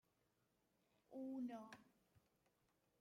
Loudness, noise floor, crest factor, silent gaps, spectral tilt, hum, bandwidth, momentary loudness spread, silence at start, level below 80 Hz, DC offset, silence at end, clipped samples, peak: -53 LUFS; -85 dBFS; 16 dB; none; -6 dB/octave; none; 16 kHz; 13 LU; 1.1 s; under -90 dBFS; under 0.1%; 1.15 s; under 0.1%; -42 dBFS